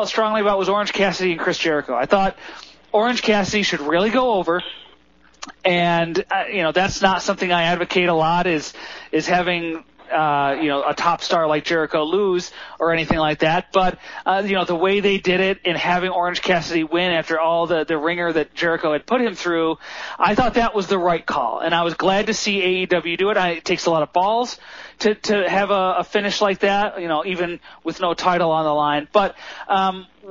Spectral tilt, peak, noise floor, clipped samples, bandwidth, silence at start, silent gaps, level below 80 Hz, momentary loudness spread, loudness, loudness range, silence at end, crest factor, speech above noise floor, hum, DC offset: -2.5 dB/octave; 0 dBFS; -54 dBFS; under 0.1%; 7.4 kHz; 0 s; none; -46 dBFS; 6 LU; -19 LUFS; 1 LU; 0 s; 20 dB; 34 dB; none; under 0.1%